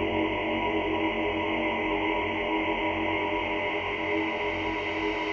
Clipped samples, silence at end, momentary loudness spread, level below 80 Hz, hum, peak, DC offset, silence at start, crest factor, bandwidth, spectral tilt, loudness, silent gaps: under 0.1%; 0 s; 2 LU; -48 dBFS; none; -14 dBFS; under 0.1%; 0 s; 14 dB; 7 kHz; -6 dB/octave; -28 LUFS; none